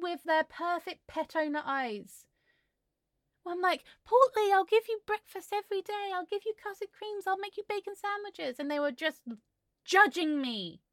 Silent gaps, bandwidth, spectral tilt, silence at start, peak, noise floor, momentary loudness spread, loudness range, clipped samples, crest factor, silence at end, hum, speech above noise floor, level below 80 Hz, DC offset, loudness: none; 17 kHz; -3 dB/octave; 0 s; -10 dBFS; -83 dBFS; 15 LU; 6 LU; under 0.1%; 24 dB; 0.15 s; none; 52 dB; -78 dBFS; under 0.1%; -31 LUFS